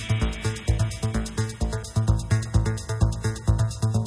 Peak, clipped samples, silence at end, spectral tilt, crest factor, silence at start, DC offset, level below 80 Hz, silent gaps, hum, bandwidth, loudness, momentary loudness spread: -8 dBFS; under 0.1%; 0 s; -6 dB/octave; 16 dB; 0 s; under 0.1%; -30 dBFS; none; none; 11 kHz; -26 LUFS; 4 LU